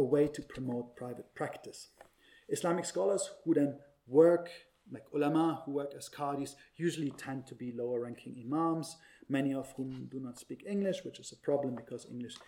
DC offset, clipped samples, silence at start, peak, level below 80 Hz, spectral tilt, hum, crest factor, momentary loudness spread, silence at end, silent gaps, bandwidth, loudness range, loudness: under 0.1%; under 0.1%; 0 s; -14 dBFS; -72 dBFS; -6 dB/octave; none; 22 dB; 16 LU; 0.05 s; none; 16.5 kHz; 6 LU; -35 LUFS